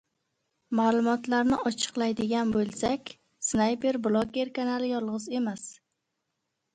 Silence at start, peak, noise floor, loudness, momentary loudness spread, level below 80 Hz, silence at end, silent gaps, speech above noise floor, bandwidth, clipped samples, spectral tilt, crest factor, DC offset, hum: 0.7 s; -12 dBFS; -81 dBFS; -28 LUFS; 8 LU; -60 dBFS; 1 s; none; 54 dB; 9.6 kHz; under 0.1%; -4 dB/octave; 18 dB; under 0.1%; none